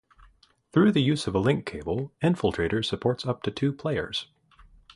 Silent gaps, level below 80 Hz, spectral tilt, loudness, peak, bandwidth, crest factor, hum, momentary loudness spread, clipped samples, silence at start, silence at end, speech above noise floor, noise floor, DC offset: none; -50 dBFS; -6.5 dB/octave; -26 LUFS; -8 dBFS; 11.5 kHz; 18 dB; none; 10 LU; under 0.1%; 0.75 s; 0.7 s; 34 dB; -59 dBFS; under 0.1%